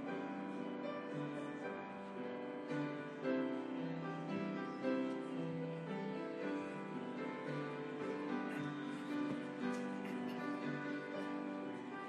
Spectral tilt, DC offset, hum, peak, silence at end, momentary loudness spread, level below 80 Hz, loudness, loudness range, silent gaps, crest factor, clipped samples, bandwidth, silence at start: -7 dB/octave; under 0.1%; none; -26 dBFS; 0 s; 5 LU; -88 dBFS; -43 LUFS; 2 LU; none; 18 dB; under 0.1%; 11.5 kHz; 0 s